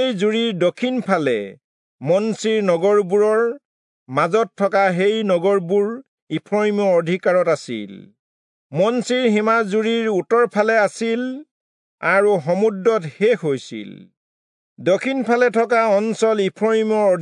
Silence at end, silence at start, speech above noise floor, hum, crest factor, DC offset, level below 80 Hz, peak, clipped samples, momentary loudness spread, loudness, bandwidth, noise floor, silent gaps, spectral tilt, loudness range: 0 s; 0 s; over 72 dB; none; 16 dB; under 0.1%; -76 dBFS; -4 dBFS; under 0.1%; 10 LU; -18 LUFS; 10.5 kHz; under -90 dBFS; 1.64-1.99 s, 3.65-4.06 s, 6.08-6.27 s, 8.19-8.70 s, 11.51-11.98 s, 14.17-14.76 s; -5.5 dB/octave; 2 LU